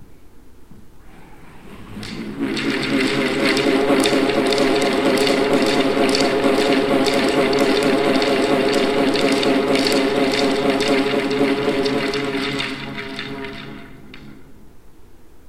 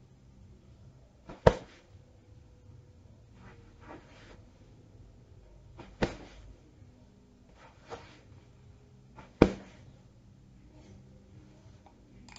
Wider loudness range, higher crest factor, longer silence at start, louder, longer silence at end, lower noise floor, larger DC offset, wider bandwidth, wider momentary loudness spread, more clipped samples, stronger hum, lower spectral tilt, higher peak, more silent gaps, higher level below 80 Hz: second, 8 LU vs 19 LU; second, 18 dB vs 38 dB; second, 0 s vs 1.3 s; first, -18 LUFS vs -30 LUFS; second, 0 s vs 2.8 s; second, -39 dBFS vs -58 dBFS; neither; first, 15.5 kHz vs 8 kHz; second, 12 LU vs 31 LU; neither; neither; second, -4 dB/octave vs -7 dB/octave; about the same, 0 dBFS vs 0 dBFS; neither; about the same, -46 dBFS vs -50 dBFS